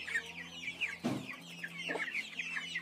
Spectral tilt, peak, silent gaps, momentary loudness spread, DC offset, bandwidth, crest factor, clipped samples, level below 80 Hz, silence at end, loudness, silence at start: -3.5 dB/octave; -24 dBFS; none; 8 LU; under 0.1%; 15.5 kHz; 16 dB; under 0.1%; -78 dBFS; 0 s; -39 LUFS; 0 s